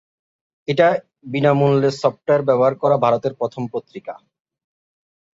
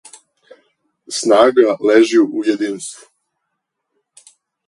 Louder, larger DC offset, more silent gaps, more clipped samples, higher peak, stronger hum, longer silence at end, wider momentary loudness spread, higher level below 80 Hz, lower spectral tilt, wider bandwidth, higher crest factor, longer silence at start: second, -18 LUFS vs -14 LUFS; neither; neither; neither; about the same, -2 dBFS vs 0 dBFS; neither; second, 1.25 s vs 1.75 s; about the same, 15 LU vs 14 LU; about the same, -62 dBFS vs -66 dBFS; first, -7.5 dB/octave vs -3.5 dB/octave; second, 7.8 kHz vs 11.5 kHz; about the same, 18 dB vs 18 dB; second, 0.7 s vs 1.1 s